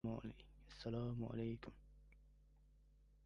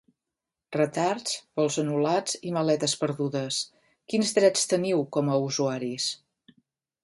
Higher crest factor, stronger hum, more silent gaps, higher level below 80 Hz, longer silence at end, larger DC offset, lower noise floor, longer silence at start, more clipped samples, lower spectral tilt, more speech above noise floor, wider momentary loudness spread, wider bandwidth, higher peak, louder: about the same, 16 dB vs 20 dB; neither; neither; first, -64 dBFS vs -74 dBFS; second, 0 s vs 0.9 s; neither; second, -70 dBFS vs -88 dBFS; second, 0.05 s vs 0.7 s; neither; first, -8.5 dB/octave vs -4 dB/octave; second, 23 dB vs 62 dB; first, 19 LU vs 9 LU; about the same, 10.5 kHz vs 11.5 kHz; second, -32 dBFS vs -8 dBFS; second, -48 LUFS vs -26 LUFS